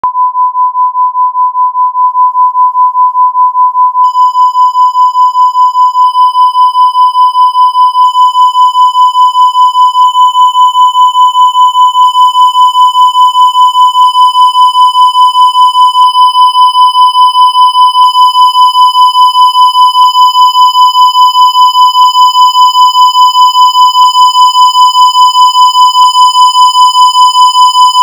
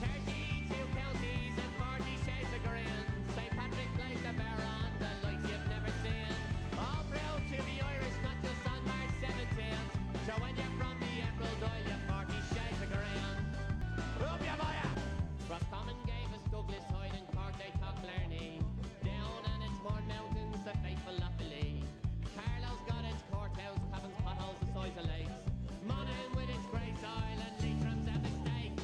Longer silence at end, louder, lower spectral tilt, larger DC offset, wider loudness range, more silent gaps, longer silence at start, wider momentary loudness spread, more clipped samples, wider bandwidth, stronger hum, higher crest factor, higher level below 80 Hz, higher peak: about the same, 0 s vs 0 s; first, -4 LUFS vs -40 LUFS; second, 4.5 dB/octave vs -6 dB/octave; neither; about the same, 3 LU vs 2 LU; neither; about the same, 0.05 s vs 0 s; about the same, 3 LU vs 3 LU; first, 20% vs under 0.1%; first, over 20 kHz vs 10.5 kHz; neither; second, 4 dB vs 16 dB; second, -72 dBFS vs -44 dBFS; first, 0 dBFS vs -24 dBFS